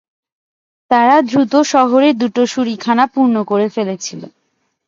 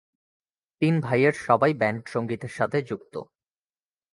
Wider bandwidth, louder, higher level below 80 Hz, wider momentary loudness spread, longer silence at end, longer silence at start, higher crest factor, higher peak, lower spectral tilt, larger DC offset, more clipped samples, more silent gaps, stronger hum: second, 7.6 kHz vs 11.5 kHz; first, -13 LUFS vs -25 LUFS; about the same, -62 dBFS vs -64 dBFS; second, 10 LU vs 13 LU; second, 0.6 s vs 0.9 s; about the same, 0.9 s vs 0.8 s; second, 14 dB vs 22 dB; first, 0 dBFS vs -4 dBFS; second, -4.5 dB/octave vs -7.5 dB/octave; neither; neither; neither; neither